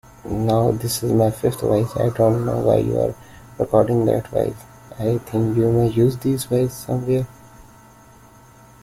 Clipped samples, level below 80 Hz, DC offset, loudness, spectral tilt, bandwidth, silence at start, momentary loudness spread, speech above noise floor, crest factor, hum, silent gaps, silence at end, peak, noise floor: under 0.1%; -46 dBFS; under 0.1%; -20 LUFS; -7 dB/octave; 16 kHz; 0.25 s; 8 LU; 28 dB; 18 dB; none; none; 1.2 s; -2 dBFS; -47 dBFS